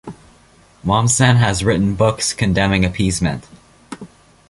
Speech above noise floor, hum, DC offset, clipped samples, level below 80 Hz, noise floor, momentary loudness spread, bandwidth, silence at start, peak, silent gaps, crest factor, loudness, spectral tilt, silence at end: 34 dB; none; under 0.1%; under 0.1%; -36 dBFS; -49 dBFS; 22 LU; 11.5 kHz; 0.05 s; -2 dBFS; none; 16 dB; -16 LUFS; -4.5 dB/octave; 0.45 s